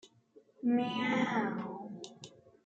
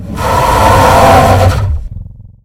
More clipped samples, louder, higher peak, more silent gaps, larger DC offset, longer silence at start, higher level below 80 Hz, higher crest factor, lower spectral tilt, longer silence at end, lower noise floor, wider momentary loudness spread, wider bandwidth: second, under 0.1% vs 2%; second, -34 LUFS vs -7 LUFS; second, -20 dBFS vs 0 dBFS; neither; neither; about the same, 0.05 s vs 0 s; second, -82 dBFS vs -20 dBFS; first, 16 dB vs 8 dB; about the same, -5.5 dB/octave vs -5.5 dB/octave; first, 0.35 s vs 0.15 s; first, -64 dBFS vs -27 dBFS; first, 19 LU vs 13 LU; second, 8 kHz vs 17 kHz